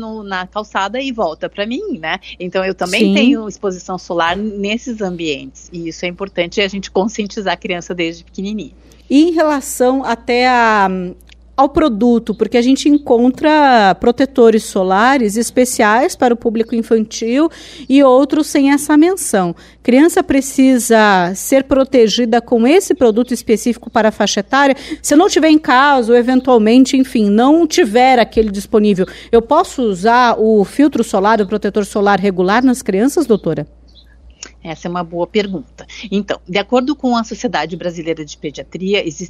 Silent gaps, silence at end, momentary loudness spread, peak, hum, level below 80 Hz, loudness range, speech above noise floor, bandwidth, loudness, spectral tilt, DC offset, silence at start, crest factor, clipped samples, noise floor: none; 0 s; 12 LU; 0 dBFS; none; -42 dBFS; 8 LU; 29 dB; 15 kHz; -13 LUFS; -4.5 dB/octave; under 0.1%; 0 s; 14 dB; under 0.1%; -42 dBFS